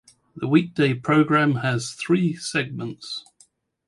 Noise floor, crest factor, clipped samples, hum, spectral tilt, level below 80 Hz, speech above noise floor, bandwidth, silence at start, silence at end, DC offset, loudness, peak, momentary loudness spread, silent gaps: -59 dBFS; 18 dB; under 0.1%; none; -6 dB/octave; -62 dBFS; 38 dB; 11.5 kHz; 0.35 s; 0.65 s; under 0.1%; -22 LUFS; -4 dBFS; 14 LU; none